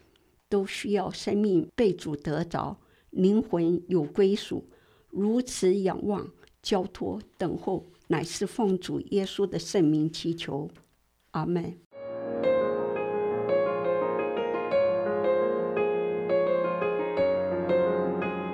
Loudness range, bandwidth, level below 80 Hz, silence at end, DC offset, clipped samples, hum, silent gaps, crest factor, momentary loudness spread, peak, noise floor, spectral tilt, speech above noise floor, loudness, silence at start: 4 LU; 13.5 kHz; -60 dBFS; 0 s; under 0.1%; under 0.1%; none; 11.86-11.90 s; 16 dB; 10 LU; -12 dBFS; -68 dBFS; -6 dB/octave; 40 dB; -28 LUFS; 0.5 s